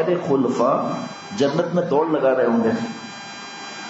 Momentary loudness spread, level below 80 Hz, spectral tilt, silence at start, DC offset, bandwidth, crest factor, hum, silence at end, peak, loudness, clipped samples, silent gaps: 15 LU; -70 dBFS; -6 dB/octave; 0 s; under 0.1%; 8 kHz; 14 dB; none; 0 s; -6 dBFS; -20 LUFS; under 0.1%; none